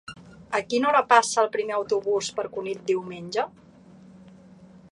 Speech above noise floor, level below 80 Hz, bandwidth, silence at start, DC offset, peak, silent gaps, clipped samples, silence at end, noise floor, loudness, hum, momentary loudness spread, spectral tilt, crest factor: 26 dB; -66 dBFS; 11.5 kHz; 0.1 s; under 0.1%; -2 dBFS; none; under 0.1%; 0.15 s; -50 dBFS; -24 LUFS; none; 12 LU; -3 dB/octave; 24 dB